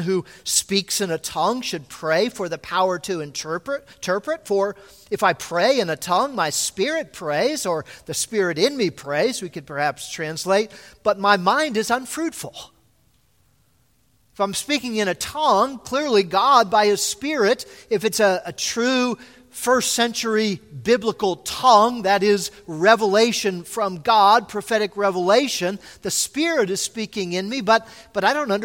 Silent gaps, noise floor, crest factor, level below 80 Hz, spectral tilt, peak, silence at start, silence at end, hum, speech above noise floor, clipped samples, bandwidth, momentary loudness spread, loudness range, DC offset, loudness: none; -62 dBFS; 20 dB; -60 dBFS; -3 dB/octave; 0 dBFS; 0 s; 0 s; none; 42 dB; under 0.1%; 16.5 kHz; 11 LU; 6 LU; under 0.1%; -21 LUFS